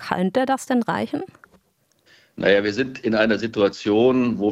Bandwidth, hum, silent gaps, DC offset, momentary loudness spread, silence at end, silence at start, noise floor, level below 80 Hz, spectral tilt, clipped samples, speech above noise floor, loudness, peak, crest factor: 14.5 kHz; none; none; under 0.1%; 7 LU; 0 s; 0 s; -64 dBFS; -58 dBFS; -5.5 dB/octave; under 0.1%; 44 dB; -21 LUFS; -2 dBFS; 18 dB